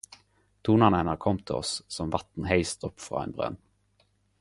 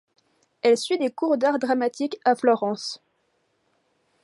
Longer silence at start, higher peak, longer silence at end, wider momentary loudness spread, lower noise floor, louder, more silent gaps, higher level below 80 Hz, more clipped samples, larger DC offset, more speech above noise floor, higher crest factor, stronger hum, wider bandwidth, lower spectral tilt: about the same, 0.65 s vs 0.65 s; about the same, -4 dBFS vs -6 dBFS; second, 0.85 s vs 1.25 s; first, 13 LU vs 8 LU; about the same, -68 dBFS vs -70 dBFS; second, -28 LUFS vs -23 LUFS; neither; first, -48 dBFS vs -80 dBFS; neither; neither; second, 41 dB vs 48 dB; first, 24 dB vs 18 dB; first, 50 Hz at -50 dBFS vs none; about the same, 11.5 kHz vs 11.5 kHz; first, -5.5 dB/octave vs -4 dB/octave